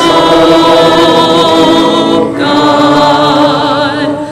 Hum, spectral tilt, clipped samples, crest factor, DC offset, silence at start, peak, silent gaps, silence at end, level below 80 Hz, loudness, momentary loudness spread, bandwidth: none; -5 dB/octave; under 0.1%; 6 dB; under 0.1%; 0 s; 0 dBFS; none; 0 s; -40 dBFS; -7 LUFS; 5 LU; 15.5 kHz